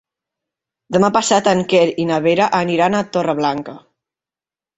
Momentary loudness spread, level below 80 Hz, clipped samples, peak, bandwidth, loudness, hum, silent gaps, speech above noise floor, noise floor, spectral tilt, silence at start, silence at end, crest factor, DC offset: 6 LU; -58 dBFS; under 0.1%; -2 dBFS; 8.2 kHz; -16 LUFS; none; none; over 74 dB; under -90 dBFS; -4.5 dB/octave; 0.9 s; 1 s; 16 dB; under 0.1%